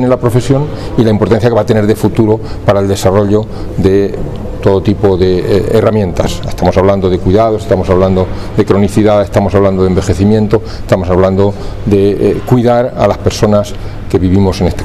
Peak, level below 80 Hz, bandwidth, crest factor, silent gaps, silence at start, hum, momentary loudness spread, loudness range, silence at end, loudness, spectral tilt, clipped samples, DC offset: 0 dBFS; -26 dBFS; 14 kHz; 10 dB; none; 0 s; none; 5 LU; 1 LU; 0 s; -10 LUFS; -7.5 dB/octave; 0.6%; 2%